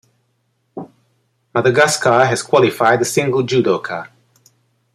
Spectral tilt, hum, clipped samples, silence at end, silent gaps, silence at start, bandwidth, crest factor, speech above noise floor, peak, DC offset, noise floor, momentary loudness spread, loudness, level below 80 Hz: -4.5 dB/octave; none; under 0.1%; 0.9 s; none; 0.75 s; 15.5 kHz; 16 dB; 51 dB; -2 dBFS; under 0.1%; -66 dBFS; 21 LU; -15 LUFS; -60 dBFS